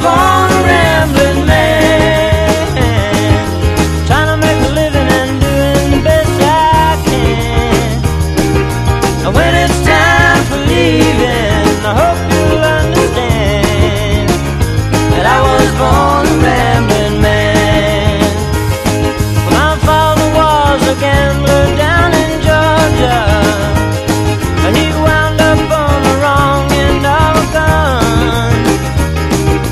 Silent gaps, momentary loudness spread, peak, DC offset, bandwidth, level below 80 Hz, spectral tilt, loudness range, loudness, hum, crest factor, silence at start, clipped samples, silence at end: none; 4 LU; 0 dBFS; under 0.1%; 14.5 kHz; -20 dBFS; -5.5 dB/octave; 2 LU; -10 LUFS; none; 10 dB; 0 s; 0.3%; 0 s